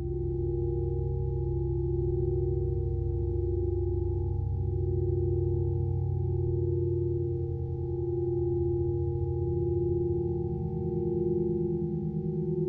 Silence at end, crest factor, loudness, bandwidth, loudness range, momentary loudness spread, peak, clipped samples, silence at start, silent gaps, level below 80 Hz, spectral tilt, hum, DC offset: 0 s; 12 dB; -30 LUFS; 0.9 kHz; 1 LU; 3 LU; -18 dBFS; under 0.1%; 0 s; none; -38 dBFS; -15 dB/octave; none; under 0.1%